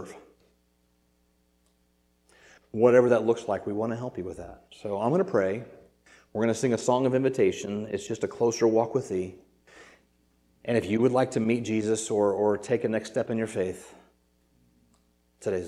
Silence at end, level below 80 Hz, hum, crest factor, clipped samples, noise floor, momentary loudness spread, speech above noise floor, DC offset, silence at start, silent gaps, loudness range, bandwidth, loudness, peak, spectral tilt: 0 s; -66 dBFS; none; 20 dB; under 0.1%; -69 dBFS; 14 LU; 43 dB; under 0.1%; 0 s; none; 3 LU; 12.5 kHz; -27 LUFS; -8 dBFS; -6 dB/octave